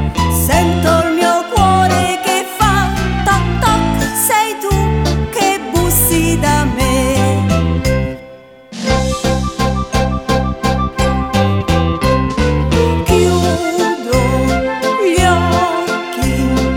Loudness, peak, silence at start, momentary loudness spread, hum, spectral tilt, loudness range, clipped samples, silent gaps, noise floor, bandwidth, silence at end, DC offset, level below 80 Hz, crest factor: -14 LUFS; 0 dBFS; 0 s; 5 LU; none; -5 dB/octave; 3 LU; under 0.1%; none; -37 dBFS; 19 kHz; 0 s; under 0.1%; -22 dBFS; 12 dB